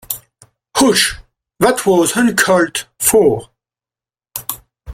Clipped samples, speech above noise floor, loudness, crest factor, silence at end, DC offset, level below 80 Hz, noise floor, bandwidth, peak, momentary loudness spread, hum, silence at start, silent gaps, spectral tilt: under 0.1%; over 77 dB; -14 LUFS; 16 dB; 0 s; under 0.1%; -46 dBFS; under -90 dBFS; 16.5 kHz; 0 dBFS; 15 LU; none; 0.1 s; none; -3 dB/octave